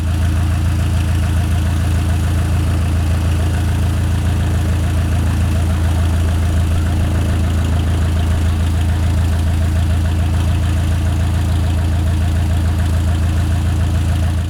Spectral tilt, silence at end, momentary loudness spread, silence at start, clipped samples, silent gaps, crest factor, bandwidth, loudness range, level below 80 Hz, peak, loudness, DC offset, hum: -6.5 dB/octave; 0 s; 1 LU; 0 s; under 0.1%; none; 8 dB; 13 kHz; 0 LU; -22 dBFS; -6 dBFS; -17 LUFS; under 0.1%; none